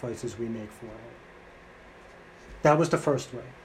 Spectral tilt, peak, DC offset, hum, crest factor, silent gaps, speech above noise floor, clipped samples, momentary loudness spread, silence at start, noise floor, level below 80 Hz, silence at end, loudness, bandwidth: -6 dB/octave; -8 dBFS; under 0.1%; none; 22 dB; none; 22 dB; under 0.1%; 27 LU; 0 s; -50 dBFS; -56 dBFS; 0 s; -27 LUFS; 14.5 kHz